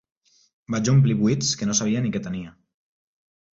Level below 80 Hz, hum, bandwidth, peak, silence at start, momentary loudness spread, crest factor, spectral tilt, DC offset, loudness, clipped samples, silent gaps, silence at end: -56 dBFS; none; 8 kHz; -8 dBFS; 0.7 s; 14 LU; 16 dB; -5 dB/octave; under 0.1%; -22 LUFS; under 0.1%; none; 1.1 s